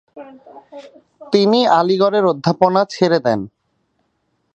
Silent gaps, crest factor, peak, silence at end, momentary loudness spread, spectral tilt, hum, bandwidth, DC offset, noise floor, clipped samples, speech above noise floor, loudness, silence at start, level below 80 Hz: none; 18 dB; 0 dBFS; 1.1 s; 7 LU; -6 dB/octave; none; 8.2 kHz; under 0.1%; -67 dBFS; under 0.1%; 51 dB; -15 LUFS; 0.15 s; -62 dBFS